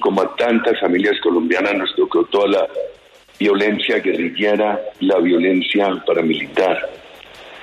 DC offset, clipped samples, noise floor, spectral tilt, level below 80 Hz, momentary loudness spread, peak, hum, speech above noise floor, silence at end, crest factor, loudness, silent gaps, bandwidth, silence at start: under 0.1%; under 0.1%; -39 dBFS; -6 dB/octave; -60 dBFS; 5 LU; -4 dBFS; none; 23 dB; 0 s; 14 dB; -17 LUFS; none; 10.5 kHz; 0 s